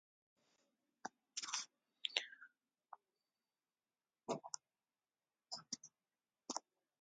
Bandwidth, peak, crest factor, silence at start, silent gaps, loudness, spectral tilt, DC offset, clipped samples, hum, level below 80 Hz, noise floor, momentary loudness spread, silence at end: 9 kHz; -16 dBFS; 38 dB; 1.05 s; none; -47 LUFS; -0.5 dB/octave; under 0.1%; under 0.1%; none; under -90 dBFS; under -90 dBFS; 22 LU; 0.4 s